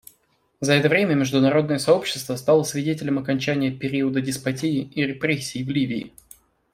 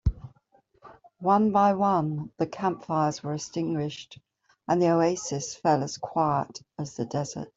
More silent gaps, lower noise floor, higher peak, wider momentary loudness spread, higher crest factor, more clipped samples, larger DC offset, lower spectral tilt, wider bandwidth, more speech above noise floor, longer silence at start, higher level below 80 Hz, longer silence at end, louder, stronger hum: neither; about the same, -64 dBFS vs -64 dBFS; first, -4 dBFS vs -10 dBFS; second, 7 LU vs 15 LU; about the same, 20 dB vs 18 dB; neither; neither; about the same, -5.5 dB/octave vs -6 dB/octave; first, 16 kHz vs 8 kHz; first, 42 dB vs 38 dB; first, 0.6 s vs 0.05 s; second, -60 dBFS vs -44 dBFS; first, 0.65 s vs 0.1 s; first, -22 LUFS vs -27 LUFS; neither